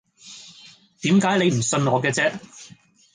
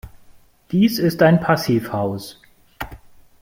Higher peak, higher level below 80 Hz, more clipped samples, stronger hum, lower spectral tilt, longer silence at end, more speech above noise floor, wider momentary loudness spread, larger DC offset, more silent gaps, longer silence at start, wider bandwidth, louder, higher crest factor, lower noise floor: second, -6 dBFS vs -2 dBFS; second, -62 dBFS vs -48 dBFS; neither; neither; second, -4.5 dB/octave vs -6.5 dB/octave; about the same, 0.5 s vs 0.45 s; about the same, 30 dB vs 31 dB; first, 23 LU vs 19 LU; neither; neither; first, 0.25 s vs 0.05 s; second, 10 kHz vs 16.5 kHz; about the same, -20 LUFS vs -18 LUFS; about the same, 18 dB vs 18 dB; about the same, -50 dBFS vs -48 dBFS